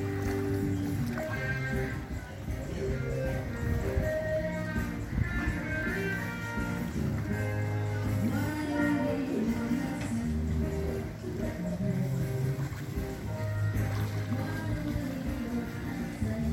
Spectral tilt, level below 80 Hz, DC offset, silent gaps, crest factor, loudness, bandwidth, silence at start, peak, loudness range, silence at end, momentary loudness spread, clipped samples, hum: -7 dB/octave; -42 dBFS; under 0.1%; none; 16 dB; -33 LUFS; 16.5 kHz; 0 s; -16 dBFS; 2 LU; 0 s; 5 LU; under 0.1%; none